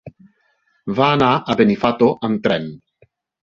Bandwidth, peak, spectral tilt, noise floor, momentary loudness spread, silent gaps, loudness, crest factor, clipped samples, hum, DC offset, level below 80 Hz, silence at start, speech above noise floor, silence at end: 7.4 kHz; -2 dBFS; -7.5 dB/octave; -63 dBFS; 10 LU; none; -17 LUFS; 18 dB; under 0.1%; none; under 0.1%; -52 dBFS; 0.05 s; 47 dB; 0.7 s